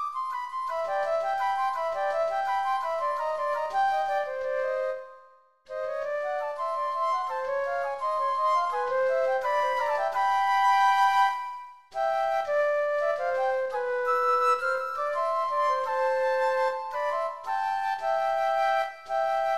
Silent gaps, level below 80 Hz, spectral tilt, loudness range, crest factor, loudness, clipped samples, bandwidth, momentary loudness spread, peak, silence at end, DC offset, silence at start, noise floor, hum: none; -68 dBFS; -1 dB/octave; 5 LU; 14 dB; -27 LUFS; under 0.1%; 14 kHz; 8 LU; -12 dBFS; 0 s; 0.2%; 0 s; -57 dBFS; none